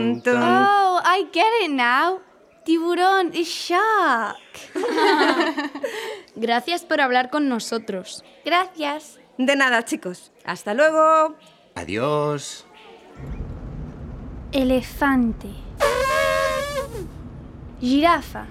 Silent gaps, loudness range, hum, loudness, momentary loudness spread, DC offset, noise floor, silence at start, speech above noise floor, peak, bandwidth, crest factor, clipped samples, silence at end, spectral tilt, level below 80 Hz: none; 6 LU; none; -20 LUFS; 19 LU; under 0.1%; -45 dBFS; 0 s; 25 dB; -4 dBFS; 16 kHz; 18 dB; under 0.1%; 0 s; -4 dB/octave; -44 dBFS